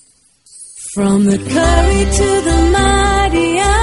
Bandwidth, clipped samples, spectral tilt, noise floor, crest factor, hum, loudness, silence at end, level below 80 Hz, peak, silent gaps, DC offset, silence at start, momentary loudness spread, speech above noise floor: 11.5 kHz; under 0.1%; -5 dB/octave; -50 dBFS; 12 dB; none; -13 LUFS; 0 s; -18 dBFS; 0 dBFS; none; under 0.1%; 0.55 s; 6 LU; 38 dB